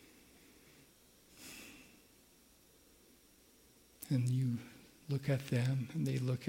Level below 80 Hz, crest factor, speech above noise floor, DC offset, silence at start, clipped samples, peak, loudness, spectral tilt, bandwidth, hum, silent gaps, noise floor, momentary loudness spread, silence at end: -74 dBFS; 18 dB; 31 dB; under 0.1%; 1.35 s; under 0.1%; -22 dBFS; -37 LUFS; -7 dB/octave; 16.5 kHz; none; none; -66 dBFS; 23 LU; 0 s